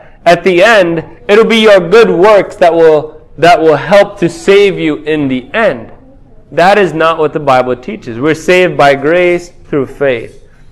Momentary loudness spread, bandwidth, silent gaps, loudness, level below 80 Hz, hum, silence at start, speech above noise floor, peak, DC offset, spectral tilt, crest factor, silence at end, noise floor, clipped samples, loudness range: 11 LU; 13 kHz; none; -8 LUFS; -40 dBFS; none; 0.25 s; 28 dB; 0 dBFS; under 0.1%; -5.5 dB/octave; 8 dB; 0.4 s; -36 dBFS; 3%; 5 LU